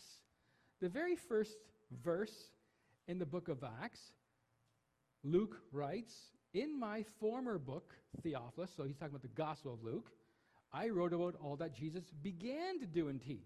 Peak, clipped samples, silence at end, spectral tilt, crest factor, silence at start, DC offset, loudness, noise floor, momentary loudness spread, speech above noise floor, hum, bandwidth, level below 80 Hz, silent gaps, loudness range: -24 dBFS; under 0.1%; 0 s; -7 dB/octave; 20 dB; 0 s; under 0.1%; -44 LUFS; -82 dBFS; 16 LU; 39 dB; none; 13.5 kHz; -76 dBFS; none; 4 LU